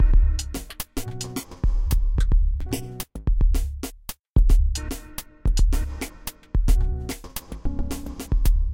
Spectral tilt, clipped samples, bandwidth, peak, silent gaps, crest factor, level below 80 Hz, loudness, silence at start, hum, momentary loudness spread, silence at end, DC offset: -5.5 dB/octave; under 0.1%; 17 kHz; -8 dBFS; 4.30-4.34 s; 14 dB; -22 dBFS; -27 LUFS; 0 s; none; 11 LU; 0 s; under 0.1%